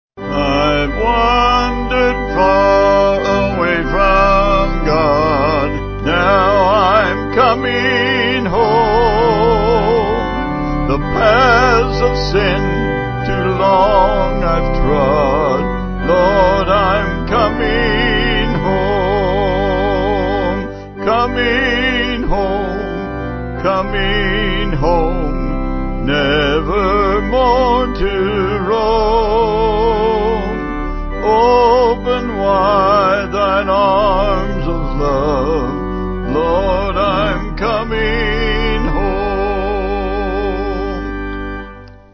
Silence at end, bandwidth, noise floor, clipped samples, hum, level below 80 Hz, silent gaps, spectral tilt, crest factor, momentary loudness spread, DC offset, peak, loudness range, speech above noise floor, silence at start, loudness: 0.2 s; 6.6 kHz; -34 dBFS; under 0.1%; none; -24 dBFS; none; -6.5 dB/octave; 14 dB; 9 LU; 0.2%; 0 dBFS; 4 LU; 20 dB; 0.15 s; -14 LUFS